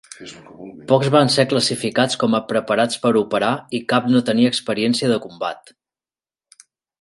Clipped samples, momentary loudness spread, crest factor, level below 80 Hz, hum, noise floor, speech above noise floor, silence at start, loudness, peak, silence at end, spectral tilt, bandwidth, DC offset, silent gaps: under 0.1%; 21 LU; 18 dB; -62 dBFS; none; under -90 dBFS; over 71 dB; 0.2 s; -18 LUFS; 0 dBFS; 1.45 s; -5 dB/octave; 11.5 kHz; under 0.1%; none